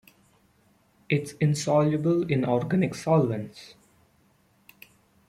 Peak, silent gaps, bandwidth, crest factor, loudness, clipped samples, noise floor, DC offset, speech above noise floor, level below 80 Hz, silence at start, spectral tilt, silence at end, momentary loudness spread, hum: -10 dBFS; none; 14.5 kHz; 18 dB; -25 LUFS; under 0.1%; -64 dBFS; under 0.1%; 39 dB; -64 dBFS; 1.1 s; -7 dB/octave; 1.6 s; 8 LU; none